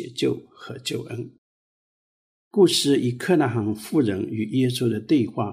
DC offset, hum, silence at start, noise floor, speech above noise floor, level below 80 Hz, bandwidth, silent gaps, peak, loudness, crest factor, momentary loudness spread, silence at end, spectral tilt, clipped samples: under 0.1%; none; 0 s; under -90 dBFS; over 68 dB; -66 dBFS; 15.5 kHz; 1.38-2.51 s; -6 dBFS; -23 LUFS; 18 dB; 15 LU; 0 s; -5.5 dB/octave; under 0.1%